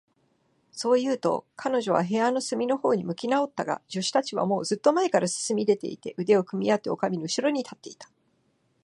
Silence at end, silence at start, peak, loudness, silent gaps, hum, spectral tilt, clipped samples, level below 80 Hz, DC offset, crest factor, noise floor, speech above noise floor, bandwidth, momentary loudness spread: 0.8 s; 0.75 s; -8 dBFS; -26 LUFS; none; none; -4.5 dB/octave; under 0.1%; -76 dBFS; under 0.1%; 20 dB; -69 dBFS; 44 dB; 11.5 kHz; 8 LU